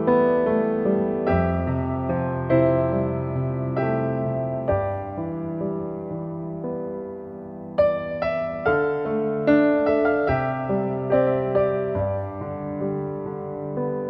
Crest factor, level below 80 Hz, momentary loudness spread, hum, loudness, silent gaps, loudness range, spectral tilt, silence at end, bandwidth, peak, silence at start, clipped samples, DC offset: 16 dB; -46 dBFS; 11 LU; none; -24 LUFS; none; 6 LU; -11 dB/octave; 0 s; 5.8 kHz; -8 dBFS; 0 s; under 0.1%; under 0.1%